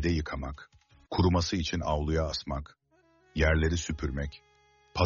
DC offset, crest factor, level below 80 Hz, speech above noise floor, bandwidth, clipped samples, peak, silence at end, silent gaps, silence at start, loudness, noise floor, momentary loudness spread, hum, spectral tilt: under 0.1%; 18 dB; -38 dBFS; 37 dB; 7.2 kHz; under 0.1%; -12 dBFS; 0 s; none; 0 s; -30 LUFS; -66 dBFS; 14 LU; none; -5 dB/octave